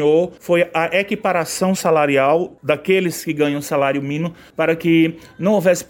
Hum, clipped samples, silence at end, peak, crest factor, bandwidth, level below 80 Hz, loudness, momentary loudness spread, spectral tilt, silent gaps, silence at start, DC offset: none; under 0.1%; 0.05 s; -2 dBFS; 14 dB; 17 kHz; -58 dBFS; -18 LUFS; 6 LU; -5.5 dB/octave; none; 0 s; under 0.1%